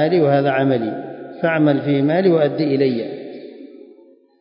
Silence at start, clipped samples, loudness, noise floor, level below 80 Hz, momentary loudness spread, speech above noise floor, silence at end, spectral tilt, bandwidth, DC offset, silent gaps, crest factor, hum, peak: 0 s; under 0.1%; -17 LUFS; -48 dBFS; -70 dBFS; 17 LU; 32 dB; 0.65 s; -12.5 dB/octave; 5.4 kHz; under 0.1%; none; 14 dB; none; -4 dBFS